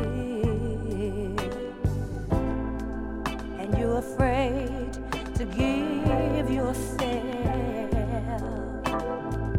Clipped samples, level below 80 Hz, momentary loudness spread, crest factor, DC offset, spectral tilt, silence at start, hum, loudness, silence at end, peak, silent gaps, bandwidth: under 0.1%; -36 dBFS; 7 LU; 18 dB; under 0.1%; -7 dB/octave; 0 s; none; -29 LUFS; 0 s; -8 dBFS; none; 15 kHz